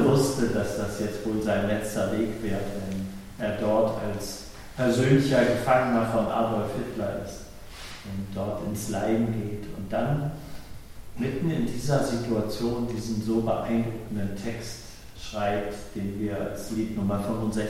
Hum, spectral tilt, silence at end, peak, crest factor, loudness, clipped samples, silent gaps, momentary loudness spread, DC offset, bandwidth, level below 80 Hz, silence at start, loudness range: none; -6 dB/octave; 0 s; -8 dBFS; 20 dB; -28 LUFS; under 0.1%; none; 16 LU; under 0.1%; 16.5 kHz; -46 dBFS; 0 s; 6 LU